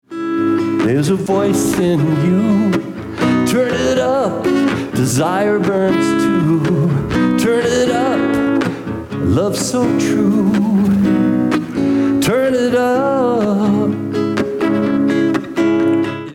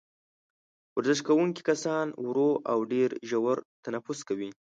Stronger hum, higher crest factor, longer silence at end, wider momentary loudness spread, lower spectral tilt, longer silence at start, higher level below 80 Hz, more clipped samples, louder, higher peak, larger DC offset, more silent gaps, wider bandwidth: neither; second, 10 dB vs 18 dB; second, 0 s vs 0.15 s; second, 4 LU vs 10 LU; about the same, -6 dB/octave vs -5 dB/octave; second, 0.1 s vs 0.95 s; first, -46 dBFS vs -78 dBFS; neither; first, -15 LUFS vs -29 LUFS; first, -6 dBFS vs -12 dBFS; neither; second, none vs 3.65-3.83 s; first, 17 kHz vs 9.2 kHz